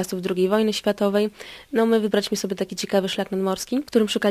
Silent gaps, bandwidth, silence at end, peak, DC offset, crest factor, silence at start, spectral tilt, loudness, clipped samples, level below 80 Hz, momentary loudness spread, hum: none; 15.5 kHz; 0 s; -6 dBFS; under 0.1%; 16 dB; 0 s; -4.5 dB/octave; -23 LUFS; under 0.1%; -60 dBFS; 7 LU; none